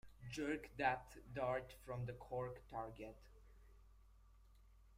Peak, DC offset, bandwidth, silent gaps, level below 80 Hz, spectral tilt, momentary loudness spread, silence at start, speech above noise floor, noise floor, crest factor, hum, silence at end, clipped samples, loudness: -24 dBFS; under 0.1%; 16 kHz; none; -64 dBFS; -6 dB/octave; 12 LU; 0.05 s; 21 dB; -67 dBFS; 24 dB; none; 0 s; under 0.1%; -46 LUFS